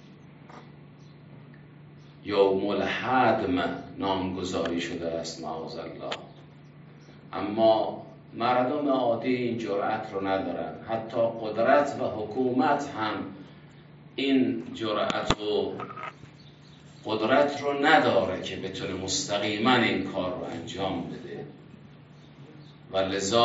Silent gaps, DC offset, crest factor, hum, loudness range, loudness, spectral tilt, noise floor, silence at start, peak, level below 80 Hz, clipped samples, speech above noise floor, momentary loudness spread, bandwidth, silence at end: none; under 0.1%; 24 dB; none; 6 LU; -27 LUFS; -3 dB/octave; -50 dBFS; 0.05 s; -4 dBFS; -60 dBFS; under 0.1%; 24 dB; 17 LU; 8 kHz; 0 s